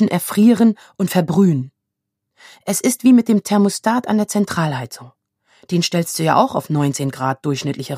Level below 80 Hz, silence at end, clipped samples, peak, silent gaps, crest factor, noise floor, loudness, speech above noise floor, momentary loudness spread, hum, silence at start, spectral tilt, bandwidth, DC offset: -62 dBFS; 0 s; under 0.1%; 0 dBFS; none; 16 dB; -79 dBFS; -17 LUFS; 62 dB; 10 LU; none; 0 s; -5.5 dB/octave; 15.5 kHz; under 0.1%